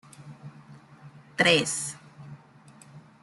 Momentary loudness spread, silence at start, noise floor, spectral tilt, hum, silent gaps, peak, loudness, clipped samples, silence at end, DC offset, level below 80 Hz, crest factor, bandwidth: 26 LU; 0.2 s; -53 dBFS; -2.5 dB/octave; none; none; -6 dBFS; -24 LUFS; under 0.1%; 0.25 s; under 0.1%; -68 dBFS; 24 dB; 12 kHz